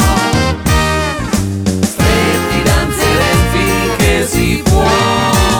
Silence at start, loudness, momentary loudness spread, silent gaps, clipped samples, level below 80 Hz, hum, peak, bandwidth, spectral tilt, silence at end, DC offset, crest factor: 0 s; -12 LUFS; 4 LU; none; under 0.1%; -20 dBFS; none; 0 dBFS; 19.5 kHz; -4.5 dB/octave; 0 s; under 0.1%; 12 dB